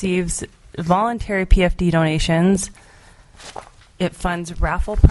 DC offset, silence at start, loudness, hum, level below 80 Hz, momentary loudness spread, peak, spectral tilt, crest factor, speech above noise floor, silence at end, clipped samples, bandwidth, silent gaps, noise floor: under 0.1%; 0 s; -20 LUFS; none; -24 dBFS; 19 LU; 0 dBFS; -5.5 dB/octave; 18 dB; 29 dB; 0 s; under 0.1%; 11.5 kHz; none; -47 dBFS